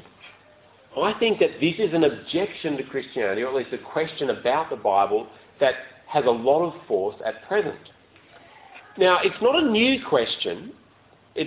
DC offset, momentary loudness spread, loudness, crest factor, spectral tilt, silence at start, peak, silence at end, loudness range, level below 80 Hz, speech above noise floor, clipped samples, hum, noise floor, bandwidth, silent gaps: under 0.1%; 12 LU; -23 LUFS; 20 dB; -9 dB/octave; 0.25 s; -4 dBFS; 0 s; 2 LU; -62 dBFS; 33 dB; under 0.1%; none; -56 dBFS; 4 kHz; none